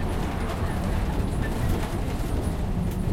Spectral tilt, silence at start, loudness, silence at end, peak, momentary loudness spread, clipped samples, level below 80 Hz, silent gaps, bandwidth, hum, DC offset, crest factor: -6.5 dB/octave; 0 s; -28 LUFS; 0 s; -12 dBFS; 2 LU; under 0.1%; -30 dBFS; none; 16.5 kHz; none; under 0.1%; 14 dB